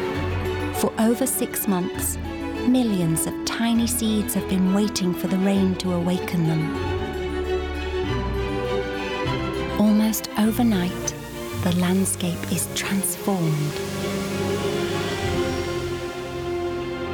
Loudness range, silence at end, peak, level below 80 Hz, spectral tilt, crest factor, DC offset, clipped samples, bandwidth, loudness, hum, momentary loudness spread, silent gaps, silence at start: 3 LU; 0 s; -10 dBFS; -40 dBFS; -5 dB/octave; 14 dB; under 0.1%; under 0.1%; over 20 kHz; -24 LUFS; none; 7 LU; none; 0 s